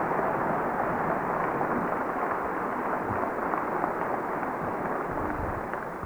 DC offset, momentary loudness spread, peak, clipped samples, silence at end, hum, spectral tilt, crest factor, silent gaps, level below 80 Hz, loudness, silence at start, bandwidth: under 0.1%; 3 LU; -10 dBFS; under 0.1%; 0 s; none; -8 dB/octave; 20 dB; none; -50 dBFS; -29 LUFS; 0 s; over 20 kHz